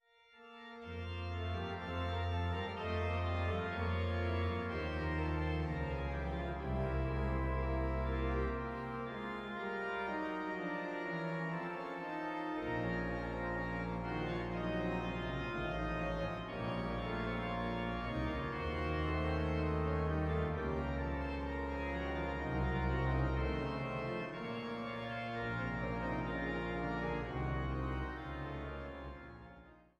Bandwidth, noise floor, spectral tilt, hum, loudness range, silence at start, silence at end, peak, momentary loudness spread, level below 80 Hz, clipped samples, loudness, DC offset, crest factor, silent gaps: 8 kHz; -61 dBFS; -8 dB/octave; none; 3 LU; 0.35 s; 0.2 s; -24 dBFS; 6 LU; -46 dBFS; under 0.1%; -39 LUFS; under 0.1%; 14 dB; none